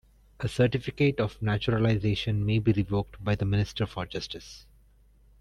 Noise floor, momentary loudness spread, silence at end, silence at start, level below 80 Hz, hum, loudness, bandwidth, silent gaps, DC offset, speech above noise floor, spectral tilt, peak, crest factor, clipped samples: -59 dBFS; 10 LU; 0.8 s; 0.4 s; -48 dBFS; none; -28 LUFS; 11 kHz; none; under 0.1%; 32 dB; -7 dB/octave; -12 dBFS; 16 dB; under 0.1%